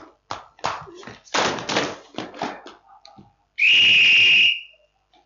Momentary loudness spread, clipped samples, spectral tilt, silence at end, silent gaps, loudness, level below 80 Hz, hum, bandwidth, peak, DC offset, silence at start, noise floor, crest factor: 24 LU; under 0.1%; -1 dB/octave; 0.6 s; none; -15 LUFS; -62 dBFS; none; 7.6 kHz; -6 dBFS; under 0.1%; 0.3 s; -60 dBFS; 14 dB